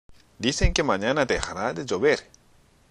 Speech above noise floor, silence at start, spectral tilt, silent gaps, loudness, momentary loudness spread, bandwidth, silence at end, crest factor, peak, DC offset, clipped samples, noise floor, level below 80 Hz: 34 dB; 0.1 s; -4 dB/octave; none; -25 LUFS; 6 LU; 11 kHz; 0.65 s; 20 dB; -6 dBFS; under 0.1%; under 0.1%; -58 dBFS; -34 dBFS